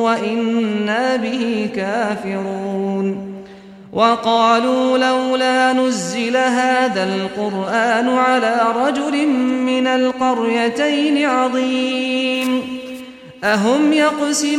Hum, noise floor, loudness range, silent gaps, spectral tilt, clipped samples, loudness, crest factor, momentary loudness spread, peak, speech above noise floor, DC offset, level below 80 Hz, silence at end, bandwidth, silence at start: none; -38 dBFS; 4 LU; none; -4 dB/octave; under 0.1%; -17 LUFS; 16 dB; 8 LU; -2 dBFS; 22 dB; under 0.1%; -60 dBFS; 0 s; 14 kHz; 0 s